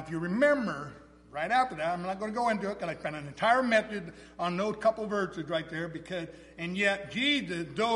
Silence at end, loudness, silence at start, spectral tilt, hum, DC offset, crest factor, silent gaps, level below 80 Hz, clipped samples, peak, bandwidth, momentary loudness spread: 0 s; -30 LUFS; 0 s; -5 dB/octave; none; under 0.1%; 18 dB; none; -62 dBFS; under 0.1%; -12 dBFS; 11.5 kHz; 13 LU